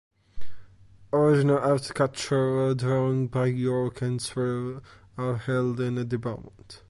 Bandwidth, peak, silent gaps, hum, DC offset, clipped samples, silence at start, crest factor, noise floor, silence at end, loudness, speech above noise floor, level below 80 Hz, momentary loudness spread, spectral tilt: 11.5 kHz; -10 dBFS; none; none; under 0.1%; under 0.1%; 0.35 s; 16 dB; -51 dBFS; 0.1 s; -26 LUFS; 26 dB; -56 dBFS; 12 LU; -7 dB/octave